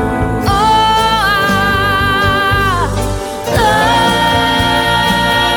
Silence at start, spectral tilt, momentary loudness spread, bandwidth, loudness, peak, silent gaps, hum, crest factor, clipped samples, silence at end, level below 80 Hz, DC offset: 0 s; -4 dB/octave; 5 LU; 19 kHz; -12 LUFS; 0 dBFS; none; none; 12 dB; under 0.1%; 0 s; -26 dBFS; under 0.1%